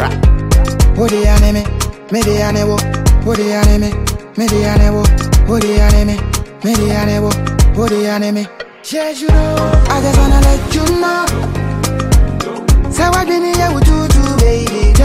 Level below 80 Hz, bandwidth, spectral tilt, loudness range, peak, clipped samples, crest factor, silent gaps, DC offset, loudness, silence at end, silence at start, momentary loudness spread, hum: -14 dBFS; 16 kHz; -5.5 dB/octave; 2 LU; 0 dBFS; under 0.1%; 10 dB; none; under 0.1%; -13 LUFS; 0 s; 0 s; 7 LU; none